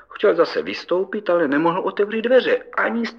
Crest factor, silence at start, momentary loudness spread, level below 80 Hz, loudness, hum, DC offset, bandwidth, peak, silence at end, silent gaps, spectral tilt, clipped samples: 16 dB; 0.1 s; 6 LU; -68 dBFS; -20 LUFS; none; under 0.1%; 6.8 kHz; -4 dBFS; 0 s; none; -6 dB/octave; under 0.1%